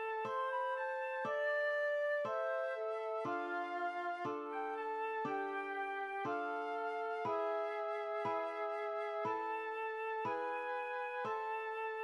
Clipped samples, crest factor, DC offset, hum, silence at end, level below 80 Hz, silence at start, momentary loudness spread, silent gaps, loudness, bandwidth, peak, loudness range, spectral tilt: under 0.1%; 12 dB; under 0.1%; none; 0 s; under -90 dBFS; 0 s; 4 LU; none; -39 LUFS; 11.5 kHz; -28 dBFS; 2 LU; -5.5 dB/octave